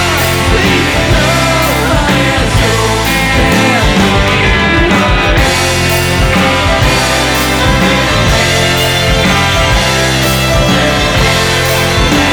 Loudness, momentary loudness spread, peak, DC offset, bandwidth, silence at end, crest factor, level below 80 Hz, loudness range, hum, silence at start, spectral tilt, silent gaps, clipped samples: -9 LUFS; 1 LU; 0 dBFS; under 0.1%; over 20 kHz; 0 s; 10 dB; -18 dBFS; 0 LU; none; 0 s; -4 dB/octave; none; under 0.1%